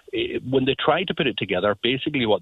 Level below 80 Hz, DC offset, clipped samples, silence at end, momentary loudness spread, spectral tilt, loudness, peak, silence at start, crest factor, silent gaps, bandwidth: -54 dBFS; under 0.1%; under 0.1%; 0 s; 3 LU; -7.5 dB/octave; -22 LUFS; -4 dBFS; 0.15 s; 18 dB; none; 4.5 kHz